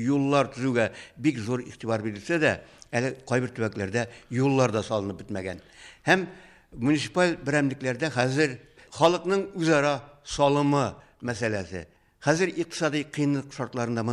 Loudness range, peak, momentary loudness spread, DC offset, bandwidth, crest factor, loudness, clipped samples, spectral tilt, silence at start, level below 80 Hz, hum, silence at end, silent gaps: 3 LU; -6 dBFS; 11 LU; under 0.1%; 11.5 kHz; 20 dB; -26 LUFS; under 0.1%; -5.5 dB/octave; 0 s; -58 dBFS; none; 0 s; none